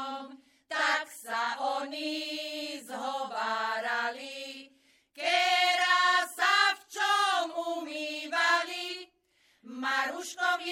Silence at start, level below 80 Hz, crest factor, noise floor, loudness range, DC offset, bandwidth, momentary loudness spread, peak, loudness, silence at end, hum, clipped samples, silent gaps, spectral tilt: 0 s; -90 dBFS; 20 dB; -69 dBFS; 7 LU; under 0.1%; 16.5 kHz; 15 LU; -10 dBFS; -29 LUFS; 0 s; none; under 0.1%; none; 0.5 dB/octave